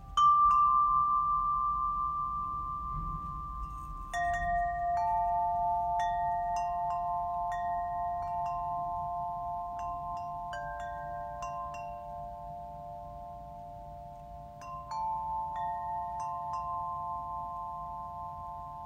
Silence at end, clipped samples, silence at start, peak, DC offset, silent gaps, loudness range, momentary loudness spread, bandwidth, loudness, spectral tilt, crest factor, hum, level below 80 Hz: 0 s; under 0.1%; 0 s; -18 dBFS; under 0.1%; none; 10 LU; 17 LU; 15 kHz; -33 LUFS; -5 dB/octave; 16 dB; none; -50 dBFS